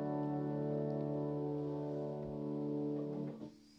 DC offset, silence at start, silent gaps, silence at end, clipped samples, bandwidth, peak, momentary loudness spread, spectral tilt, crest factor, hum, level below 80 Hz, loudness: under 0.1%; 0 s; none; 0 s; under 0.1%; 6.2 kHz; -28 dBFS; 4 LU; -10.5 dB/octave; 12 dB; none; -70 dBFS; -40 LUFS